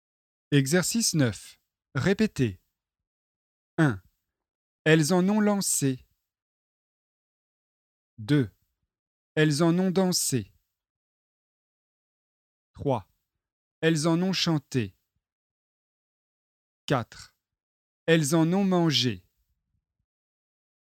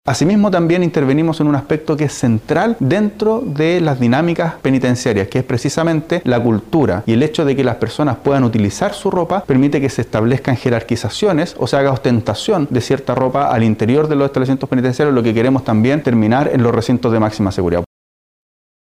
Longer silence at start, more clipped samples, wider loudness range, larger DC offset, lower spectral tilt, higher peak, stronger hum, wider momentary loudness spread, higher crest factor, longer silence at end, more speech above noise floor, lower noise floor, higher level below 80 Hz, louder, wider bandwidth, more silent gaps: first, 0.5 s vs 0.05 s; neither; first, 8 LU vs 2 LU; neither; second, -4.5 dB/octave vs -7 dB/octave; second, -6 dBFS vs -2 dBFS; neither; first, 13 LU vs 4 LU; first, 22 dB vs 12 dB; first, 1.65 s vs 1 s; second, 51 dB vs over 76 dB; second, -75 dBFS vs under -90 dBFS; second, -62 dBFS vs -44 dBFS; second, -25 LUFS vs -15 LUFS; about the same, 17 kHz vs 15.5 kHz; first, 3.07-3.77 s, 4.55-4.85 s, 6.42-8.17 s, 8.99-9.36 s, 10.90-12.74 s, 13.52-13.82 s, 15.32-16.88 s, 17.63-18.06 s vs none